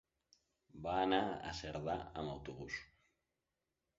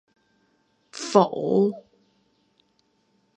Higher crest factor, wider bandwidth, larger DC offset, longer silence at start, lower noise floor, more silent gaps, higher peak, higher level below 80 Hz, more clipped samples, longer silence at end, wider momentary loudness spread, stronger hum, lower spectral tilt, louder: about the same, 24 dB vs 26 dB; second, 7.6 kHz vs 9.8 kHz; neither; second, 0.75 s vs 0.95 s; first, -89 dBFS vs -68 dBFS; neither; second, -18 dBFS vs -2 dBFS; first, -62 dBFS vs -78 dBFS; neither; second, 1.15 s vs 1.55 s; second, 12 LU vs 21 LU; neither; second, -3.5 dB/octave vs -6 dB/octave; second, -41 LUFS vs -22 LUFS